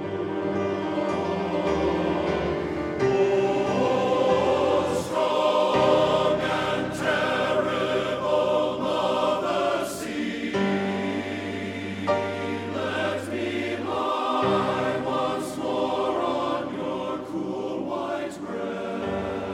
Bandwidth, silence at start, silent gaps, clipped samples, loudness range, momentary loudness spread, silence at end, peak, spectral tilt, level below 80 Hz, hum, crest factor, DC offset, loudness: 15.5 kHz; 0 s; none; under 0.1%; 6 LU; 8 LU; 0 s; -8 dBFS; -5.5 dB/octave; -52 dBFS; none; 16 dB; under 0.1%; -25 LUFS